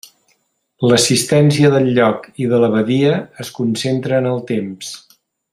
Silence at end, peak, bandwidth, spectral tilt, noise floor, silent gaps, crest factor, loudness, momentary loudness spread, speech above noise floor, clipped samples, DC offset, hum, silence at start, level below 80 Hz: 0.55 s; -2 dBFS; 15.5 kHz; -5 dB/octave; -63 dBFS; none; 14 dB; -15 LUFS; 13 LU; 49 dB; under 0.1%; under 0.1%; none; 0.8 s; -56 dBFS